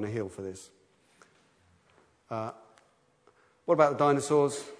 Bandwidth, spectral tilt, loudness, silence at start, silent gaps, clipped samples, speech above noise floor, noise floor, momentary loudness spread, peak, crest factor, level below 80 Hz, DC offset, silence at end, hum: 11 kHz; -5.5 dB/octave; -28 LUFS; 0 s; none; under 0.1%; 38 dB; -66 dBFS; 18 LU; -8 dBFS; 24 dB; -74 dBFS; under 0.1%; 0.05 s; none